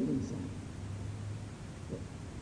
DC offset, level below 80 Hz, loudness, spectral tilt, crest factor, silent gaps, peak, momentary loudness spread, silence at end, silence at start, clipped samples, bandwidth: under 0.1%; -54 dBFS; -42 LUFS; -7 dB/octave; 16 dB; none; -24 dBFS; 9 LU; 0 s; 0 s; under 0.1%; 10.5 kHz